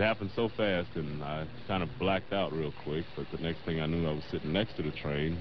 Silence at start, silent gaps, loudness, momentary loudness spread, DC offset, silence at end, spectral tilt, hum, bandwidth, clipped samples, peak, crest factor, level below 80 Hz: 0 s; none; -34 LUFS; 7 LU; 0.6%; 0 s; -4.5 dB/octave; none; 6 kHz; under 0.1%; -14 dBFS; 18 dB; -50 dBFS